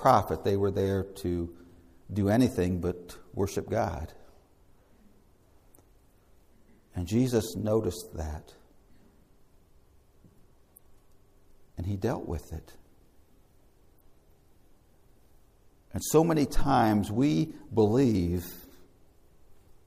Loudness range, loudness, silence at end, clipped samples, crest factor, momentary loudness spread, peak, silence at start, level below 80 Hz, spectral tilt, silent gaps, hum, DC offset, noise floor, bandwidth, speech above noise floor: 15 LU; -29 LUFS; 0.35 s; under 0.1%; 22 dB; 17 LU; -8 dBFS; 0 s; -48 dBFS; -6.5 dB/octave; none; none; under 0.1%; -60 dBFS; 15.5 kHz; 33 dB